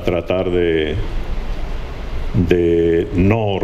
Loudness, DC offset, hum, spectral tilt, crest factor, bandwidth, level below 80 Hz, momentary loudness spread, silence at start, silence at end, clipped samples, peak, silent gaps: -17 LUFS; under 0.1%; none; -8 dB/octave; 16 dB; 13 kHz; -24 dBFS; 14 LU; 0 s; 0 s; under 0.1%; 0 dBFS; none